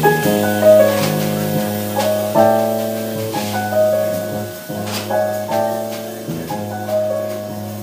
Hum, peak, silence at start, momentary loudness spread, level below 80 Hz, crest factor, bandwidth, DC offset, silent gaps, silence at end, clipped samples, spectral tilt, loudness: none; 0 dBFS; 0 s; 13 LU; -56 dBFS; 18 dB; 16 kHz; under 0.1%; none; 0 s; under 0.1%; -5 dB/octave; -18 LUFS